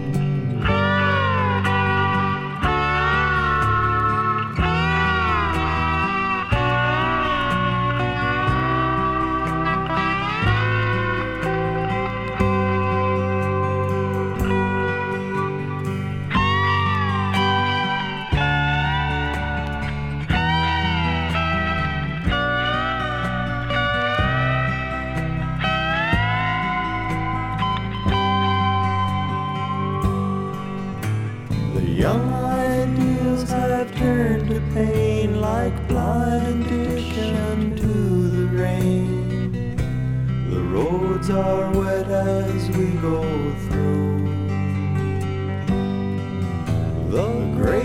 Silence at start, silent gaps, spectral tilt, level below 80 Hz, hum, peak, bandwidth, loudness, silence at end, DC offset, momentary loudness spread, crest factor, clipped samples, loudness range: 0 s; none; -7 dB/octave; -34 dBFS; none; -4 dBFS; 15.5 kHz; -21 LUFS; 0 s; under 0.1%; 6 LU; 18 dB; under 0.1%; 3 LU